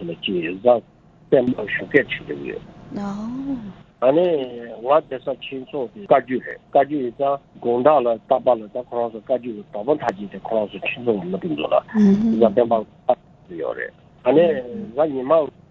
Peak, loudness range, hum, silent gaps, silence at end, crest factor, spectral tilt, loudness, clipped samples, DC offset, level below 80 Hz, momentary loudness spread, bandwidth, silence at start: 0 dBFS; 3 LU; none; none; 0.2 s; 20 dB; -8 dB/octave; -21 LUFS; under 0.1%; under 0.1%; -56 dBFS; 13 LU; 7.2 kHz; 0 s